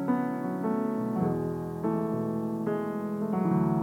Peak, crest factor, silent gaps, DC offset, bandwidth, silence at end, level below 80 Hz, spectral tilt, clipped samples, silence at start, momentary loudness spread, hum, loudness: -16 dBFS; 14 dB; none; under 0.1%; 16.5 kHz; 0 s; -60 dBFS; -9.5 dB/octave; under 0.1%; 0 s; 5 LU; none; -30 LUFS